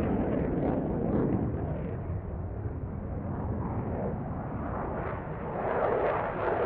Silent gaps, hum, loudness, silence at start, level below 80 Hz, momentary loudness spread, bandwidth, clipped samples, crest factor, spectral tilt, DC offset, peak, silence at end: none; none; -32 LUFS; 0 s; -42 dBFS; 8 LU; 4.4 kHz; under 0.1%; 16 dB; -8.5 dB/octave; under 0.1%; -14 dBFS; 0 s